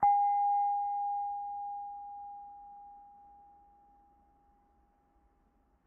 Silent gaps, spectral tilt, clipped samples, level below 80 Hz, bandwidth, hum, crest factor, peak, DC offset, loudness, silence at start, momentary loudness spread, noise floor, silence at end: none; 1 dB/octave; under 0.1%; -72 dBFS; 2.2 kHz; none; 18 dB; -18 dBFS; under 0.1%; -33 LUFS; 0 s; 24 LU; -71 dBFS; 2.75 s